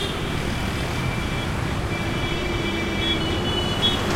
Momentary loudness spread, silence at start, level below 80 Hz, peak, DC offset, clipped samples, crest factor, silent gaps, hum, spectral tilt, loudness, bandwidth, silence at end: 5 LU; 0 s; -34 dBFS; -8 dBFS; under 0.1%; under 0.1%; 16 dB; none; none; -4.5 dB/octave; -24 LUFS; 16.5 kHz; 0 s